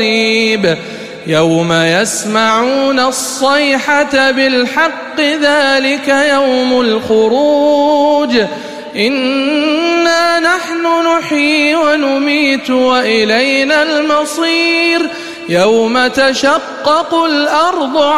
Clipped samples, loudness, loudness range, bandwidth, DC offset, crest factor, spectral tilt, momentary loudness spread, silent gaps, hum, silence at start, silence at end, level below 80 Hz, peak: under 0.1%; -11 LUFS; 1 LU; 15.5 kHz; 0.3%; 10 dB; -3.5 dB/octave; 4 LU; none; none; 0 s; 0 s; -52 dBFS; 0 dBFS